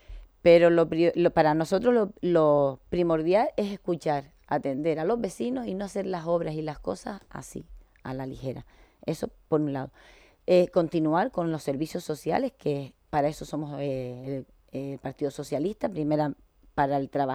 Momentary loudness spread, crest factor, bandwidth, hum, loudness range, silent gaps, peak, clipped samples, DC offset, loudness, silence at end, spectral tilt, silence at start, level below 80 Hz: 15 LU; 20 dB; 14.5 kHz; none; 10 LU; none; -8 dBFS; under 0.1%; under 0.1%; -27 LUFS; 0 s; -7 dB/octave; 0.1 s; -54 dBFS